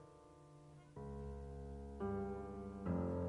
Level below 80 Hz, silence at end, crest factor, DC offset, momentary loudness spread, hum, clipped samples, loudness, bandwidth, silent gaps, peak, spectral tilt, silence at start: -56 dBFS; 0 s; 16 dB; under 0.1%; 19 LU; none; under 0.1%; -47 LUFS; 10.5 kHz; none; -30 dBFS; -9.5 dB/octave; 0 s